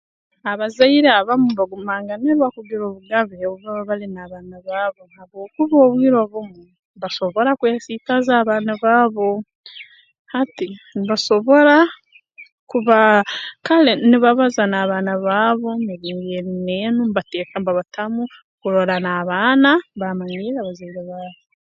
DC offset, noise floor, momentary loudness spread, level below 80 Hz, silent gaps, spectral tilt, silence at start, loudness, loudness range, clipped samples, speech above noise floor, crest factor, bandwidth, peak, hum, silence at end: under 0.1%; -45 dBFS; 16 LU; -64 dBFS; 6.79-6.94 s, 9.55-9.64 s, 10.19-10.25 s, 12.52-12.67 s, 18.44-18.58 s; -5.5 dB/octave; 0.45 s; -17 LUFS; 6 LU; under 0.1%; 28 dB; 18 dB; 7.6 kHz; 0 dBFS; none; 0.45 s